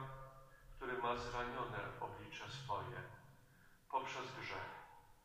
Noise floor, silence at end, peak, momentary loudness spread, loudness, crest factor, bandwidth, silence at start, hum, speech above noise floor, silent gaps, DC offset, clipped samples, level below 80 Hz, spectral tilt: -67 dBFS; 0.05 s; -28 dBFS; 19 LU; -46 LUFS; 20 dB; 15.5 kHz; 0 s; none; 21 dB; none; under 0.1%; under 0.1%; -64 dBFS; -4.5 dB/octave